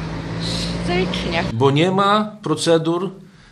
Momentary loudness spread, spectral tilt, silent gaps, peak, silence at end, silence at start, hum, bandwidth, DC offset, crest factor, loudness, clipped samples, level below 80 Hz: 9 LU; -5.5 dB/octave; none; 0 dBFS; 0.25 s; 0 s; none; 12.5 kHz; under 0.1%; 18 dB; -19 LUFS; under 0.1%; -38 dBFS